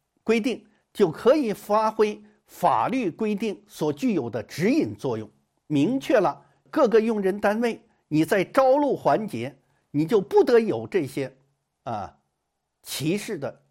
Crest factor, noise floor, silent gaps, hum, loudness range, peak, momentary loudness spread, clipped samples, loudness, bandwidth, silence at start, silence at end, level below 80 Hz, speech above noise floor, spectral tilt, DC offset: 18 dB; -78 dBFS; none; none; 3 LU; -6 dBFS; 14 LU; under 0.1%; -24 LUFS; 16.5 kHz; 0.25 s; 0.2 s; -64 dBFS; 55 dB; -6 dB/octave; under 0.1%